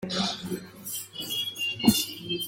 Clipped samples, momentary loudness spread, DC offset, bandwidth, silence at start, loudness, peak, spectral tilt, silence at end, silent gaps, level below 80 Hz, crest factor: under 0.1%; 12 LU; under 0.1%; 17 kHz; 0 s; -28 LUFS; -6 dBFS; -3 dB/octave; 0 s; none; -60 dBFS; 22 dB